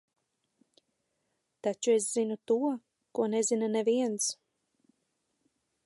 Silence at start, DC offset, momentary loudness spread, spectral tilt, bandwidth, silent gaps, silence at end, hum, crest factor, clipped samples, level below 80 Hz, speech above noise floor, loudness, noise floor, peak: 1.65 s; under 0.1%; 9 LU; -3.5 dB/octave; 12 kHz; none; 1.5 s; none; 16 dB; under 0.1%; -88 dBFS; 51 dB; -30 LUFS; -80 dBFS; -16 dBFS